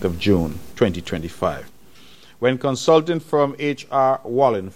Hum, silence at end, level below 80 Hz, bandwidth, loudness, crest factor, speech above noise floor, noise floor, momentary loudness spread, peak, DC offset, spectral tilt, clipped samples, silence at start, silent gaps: none; 0.05 s; -46 dBFS; 16 kHz; -20 LUFS; 18 dB; 29 dB; -49 dBFS; 9 LU; -2 dBFS; under 0.1%; -6 dB/octave; under 0.1%; 0 s; none